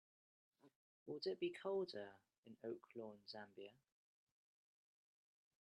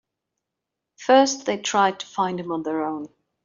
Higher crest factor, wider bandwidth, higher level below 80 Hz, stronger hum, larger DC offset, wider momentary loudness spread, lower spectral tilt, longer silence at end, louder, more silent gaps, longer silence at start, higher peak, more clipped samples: about the same, 20 dB vs 20 dB; first, 10 kHz vs 7.6 kHz; second, under -90 dBFS vs -70 dBFS; neither; neither; first, 17 LU vs 14 LU; first, -6 dB/octave vs -3.5 dB/octave; first, 1.9 s vs 0.4 s; second, -50 LUFS vs -22 LUFS; first, 0.76-1.06 s, 2.38-2.43 s vs none; second, 0.65 s vs 1 s; second, -34 dBFS vs -4 dBFS; neither